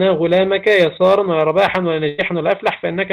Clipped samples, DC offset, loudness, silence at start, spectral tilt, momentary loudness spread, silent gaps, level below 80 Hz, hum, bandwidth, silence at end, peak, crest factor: under 0.1%; under 0.1%; -15 LUFS; 0 s; -6.5 dB/octave; 6 LU; none; -54 dBFS; none; 10 kHz; 0 s; -4 dBFS; 12 dB